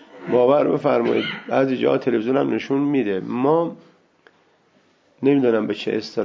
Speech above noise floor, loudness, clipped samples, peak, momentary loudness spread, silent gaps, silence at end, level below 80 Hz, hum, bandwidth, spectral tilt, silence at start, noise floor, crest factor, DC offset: 40 dB; -20 LUFS; under 0.1%; -4 dBFS; 6 LU; none; 0 s; -68 dBFS; none; 7.2 kHz; -7.5 dB/octave; 0.15 s; -59 dBFS; 16 dB; under 0.1%